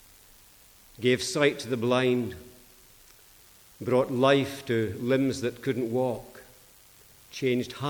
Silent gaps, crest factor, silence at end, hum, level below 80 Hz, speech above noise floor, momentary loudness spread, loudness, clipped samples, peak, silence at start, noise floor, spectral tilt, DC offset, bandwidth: none; 20 dB; 0 s; none; -62 dBFS; 29 dB; 14 LU; -27 LUFS; under 0.1%; -8 dBFS; 1 s; -55 dBFS; -5.5 dB/octave; under 0.1%; over 20 kHz